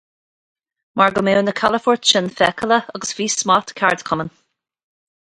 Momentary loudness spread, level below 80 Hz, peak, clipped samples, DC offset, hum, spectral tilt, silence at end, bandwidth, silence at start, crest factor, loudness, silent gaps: 9 LU; -56 dBFS; 0 dBFS; under 0.1%; under 0.1%; none; -3 dB/octave; 1.1 s; 11.5 kHz; 0.95 s; 20 dB; -17 LUFS; none